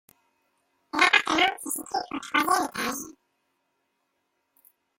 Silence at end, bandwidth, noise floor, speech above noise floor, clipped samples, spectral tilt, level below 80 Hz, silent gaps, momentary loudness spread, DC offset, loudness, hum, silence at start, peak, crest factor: 1.9 s; 16.5 kHz; -76 dBFS; 49 dB; under 0.1%; -1 dB/octave; -66 dBFS; none; 13 LU; under 0.1%; -24 LUFS; none; 0.95 s; -4 dBFS; 26 dB